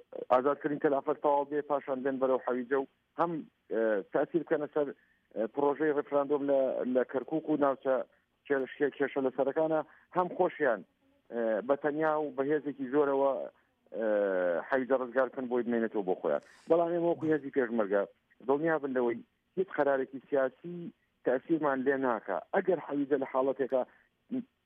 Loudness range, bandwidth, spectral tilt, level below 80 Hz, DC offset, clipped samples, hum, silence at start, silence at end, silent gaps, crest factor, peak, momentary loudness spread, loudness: 2 LU; 4 kHz; -9 dB/octave; -82 dBFS; under 0.1%; under 0.1%; none; 0.1 s; 0.2 s; none; 18 dB; -14 dBFS; 8 LU; -31 LUFS